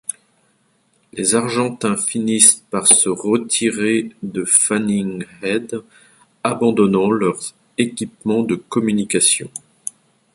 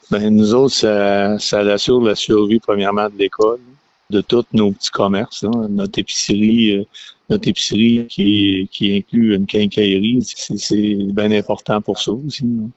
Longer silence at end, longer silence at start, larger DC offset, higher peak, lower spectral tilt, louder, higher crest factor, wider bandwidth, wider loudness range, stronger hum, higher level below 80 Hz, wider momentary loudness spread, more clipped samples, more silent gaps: first, 0.75 s vs 0.05 s; first, 1.15 s vs 0.1 s; neither; about the same, 0 dBFS vs -2 dBFS; second, -3 dB/octave vs -5 dB/octave; about the same, -16 LUFS vs -16 LUFS; about the same, 18 dB vs 14 dB; first, 16 kHz vs 8.2 kHz; about the same, 5 LU vs 3 LU; neither; second, -60 dBFS vs -48 dBFS; first, 17 LU vs 7 LU; neither; neither